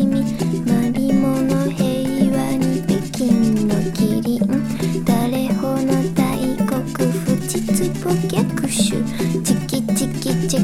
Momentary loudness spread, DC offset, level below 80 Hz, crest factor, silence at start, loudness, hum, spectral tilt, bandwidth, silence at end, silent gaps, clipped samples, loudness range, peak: 3 LU; under 0.1%; -42 dBFS; 16 dB; 0 s; -19 LUFS; none; -6 dB/octave; 16.5 kHz; 0 s; none; under 0.1%; 1 LU; -2 dBFS